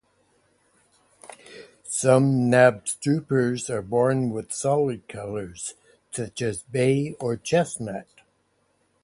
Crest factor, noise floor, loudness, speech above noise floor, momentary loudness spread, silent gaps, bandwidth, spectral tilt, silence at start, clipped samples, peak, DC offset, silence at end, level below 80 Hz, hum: 22 dB; -68 dBFS; -24 LUFS; 45 dB; 17 LU; none; 11.5 kHz; -5.5 dB/octave; 1.25 s; under 0.1%; -4 dBFS; under 0.1%; 1 s; -60 dBFS; none